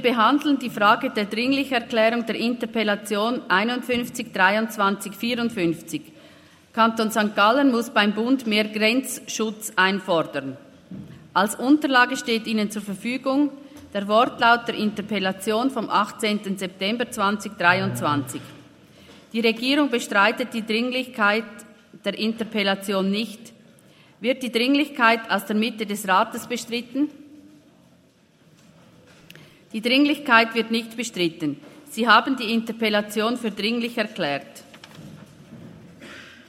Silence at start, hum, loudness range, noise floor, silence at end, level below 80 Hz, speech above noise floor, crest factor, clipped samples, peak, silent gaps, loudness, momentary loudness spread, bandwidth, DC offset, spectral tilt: 0 s; none; 5 LU; -57 dBFS; 0.15 s; -70 dBFS; 35 dB; 22 dB; under 0.1%; 0 dBFS; none; -22 LUFS; 12 LU; 16 kHz; under 0.1%; -4 dB/octave